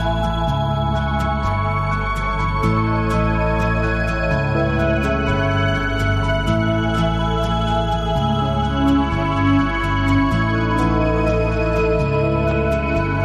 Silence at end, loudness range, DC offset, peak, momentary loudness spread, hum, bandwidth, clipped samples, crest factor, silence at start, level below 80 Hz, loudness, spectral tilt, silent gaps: 0 s; 2 LU; under 0.1%; -4 dBFS; 3 LU; none; 10.5 kHz; under 0.1%; 14 dB; 0 s; -26 dBFS; -19 LUFS; -7 dB/octave; none